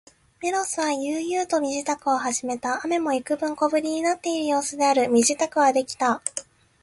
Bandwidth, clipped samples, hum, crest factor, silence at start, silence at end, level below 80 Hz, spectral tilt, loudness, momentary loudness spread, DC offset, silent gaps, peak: 11.5 kHz; under 0.1%; none; 20 dB; 0.4 s; 0.4 s; -66 dBFS; -2 dB/octave; -23 LUFS; 7 LU; under 0.1%; none; -4 dBFS